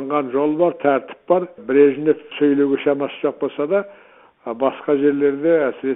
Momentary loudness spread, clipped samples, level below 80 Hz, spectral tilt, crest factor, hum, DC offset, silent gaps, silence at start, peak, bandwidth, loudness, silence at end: 8 LU; under 0.1%; -68 dBFS; -11 dB/octave; 16 dB; none; under 0.1%; none; 0 s; -2 dBFS; 3.9 kHz; -19 LUFS; 0 s